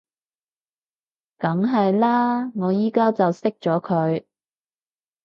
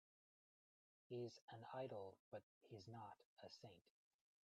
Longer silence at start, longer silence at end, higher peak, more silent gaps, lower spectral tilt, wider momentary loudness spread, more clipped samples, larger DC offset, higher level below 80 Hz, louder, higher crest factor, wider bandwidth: first, 1.4 s vs 1.1 s; first, 1.05 s vs 0.65 s; first, -6 dBFS vs -40 dBFS; second, none vs 1.42-1.48 s, 2.19-2.32 s, 2.43-2.61 s, 3.25-3.37 s; first, -9 dB/octave vs -6 dB/octave; second, 6 LU vs 10 LU; neither; neither; first, -72 dBFS vs under -90 dBFS; first, -21 LUFS vs -58 LUFS; about the same, 16 dB vs 20 dB; second, 7.2 kHz vs 8.4 kHz